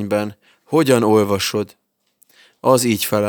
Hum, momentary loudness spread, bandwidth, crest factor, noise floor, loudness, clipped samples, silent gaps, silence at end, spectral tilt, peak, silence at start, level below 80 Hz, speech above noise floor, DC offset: none; 11 LU; over 20 kHz; 18 dB; -60 dBFS; -17 LUFS; under 0.1%; none; 0 s; -4.5 dB/octave; 0 dBFS; 0 s; -64 dBFS; 43 dB; under 0.1%